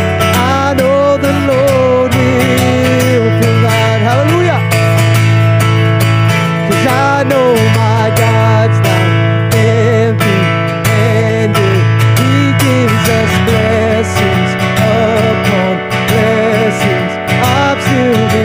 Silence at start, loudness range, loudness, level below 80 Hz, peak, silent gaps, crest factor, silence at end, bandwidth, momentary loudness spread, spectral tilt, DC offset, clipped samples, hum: 0 s; 1 LU; -10 LUFS; -40 dBFS; 0 dBFS; none; 10 dB; 0 s; 16 kHz; 2 LU; -6 dB/octave; under 0.1%; under 0.1%; none